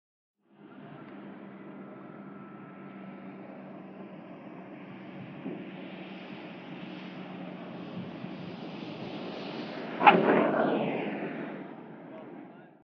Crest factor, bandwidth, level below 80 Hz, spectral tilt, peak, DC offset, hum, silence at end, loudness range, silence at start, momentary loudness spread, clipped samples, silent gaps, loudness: 28 dB; 6.2 kHz; -82 dBFS; -4 dB/octave; -4 dBFS; under 0.1%; none; 0.05 s; 18 LU; 0.6 s; 21 LU; under 0.1%; none; -31 LUFS